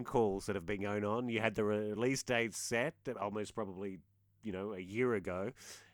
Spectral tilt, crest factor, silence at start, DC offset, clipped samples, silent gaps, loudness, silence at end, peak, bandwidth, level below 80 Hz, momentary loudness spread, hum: -5 dB/octave; 20 dB; 0 s; under 0.1%; under 0.1%; none; -37 LUFS; 0.1 s; -18 dBFS; 20 kHz; -64 dBFS; 11 LU; none